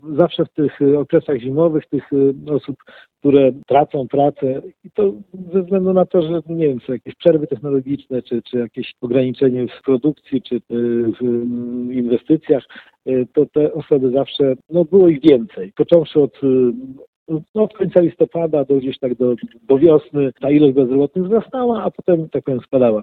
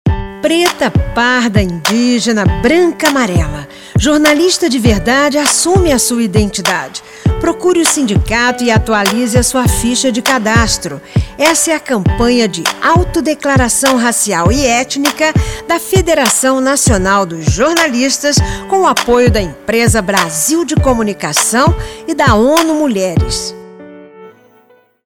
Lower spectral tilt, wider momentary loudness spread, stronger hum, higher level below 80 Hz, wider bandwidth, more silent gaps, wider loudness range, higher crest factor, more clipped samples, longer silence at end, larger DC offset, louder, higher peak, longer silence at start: first, -10.5 dB/octave vs -4 dB/octave; first, 10 LU vs 6 LU; neither; second, -56 dBFS vs -24 dBFS; second, 4.6 kHz vs over 20 kHz; first, 17.08-17.26 s, 17.49-17.54 s vs none; first, 4 LU vs 1 LU; about the same, 16 dB vs 12 dB; neither; second, 0 s vs 0.75 s; neither; second, -17 LUFS vs -11 LUFS; about the same, 0 dBFS vs 0 dBFS; about the same, 0.05 s vs 0.05 s